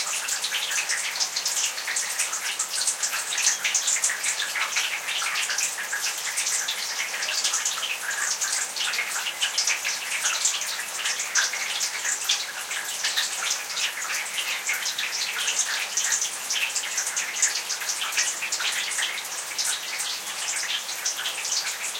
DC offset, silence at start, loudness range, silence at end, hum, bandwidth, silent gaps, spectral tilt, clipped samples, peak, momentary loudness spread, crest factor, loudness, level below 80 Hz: under 0.1%; 0 s; 2 LU; 0 s; none; 17 kHz; none; 3.5 dB/octave; under 0.1%; -6 dBFS; 5 LU; 20 dB; -24 LUFS; -80 dBFS